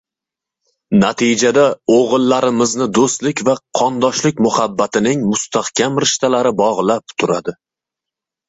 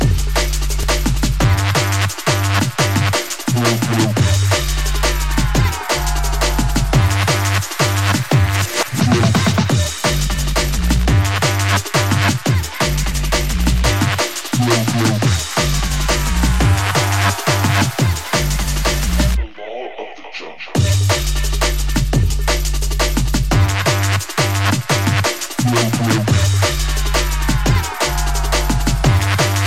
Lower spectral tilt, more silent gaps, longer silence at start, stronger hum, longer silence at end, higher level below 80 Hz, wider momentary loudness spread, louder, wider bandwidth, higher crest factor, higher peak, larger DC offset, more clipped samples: about the same, -4 dB/octave vs -4.5 dB/octave; neither; first, 0.9 s vs 0 s; neither; first, 0.95 s vs 0 s; second, -54 dBFS vs -22 dBFS; about the same, 5 LU vs 4 LU; about the same, -15 LUFS vs -16 LUFS; second, 8.2 kHz vs 16.5 kHz; about the same, 14 dB vs 14 dB; about the same, -2 dBFS vs -2 dBFS; second, under 0.1% vs 1%; neither